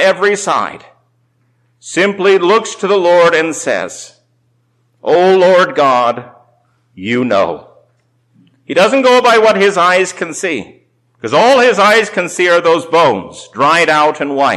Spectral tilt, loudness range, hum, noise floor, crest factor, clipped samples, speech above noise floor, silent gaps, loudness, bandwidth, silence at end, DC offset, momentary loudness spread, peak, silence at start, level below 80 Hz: -3.5 dB/octave; 3 LU; none; -58 dBFS; 10 dB; under 0.1%; 47 dB; none; -11 LUFS; 13.5 kHz; 0 s; under 0.1%; 12 LU; -2 dBFS; 0 s; -60 dBFS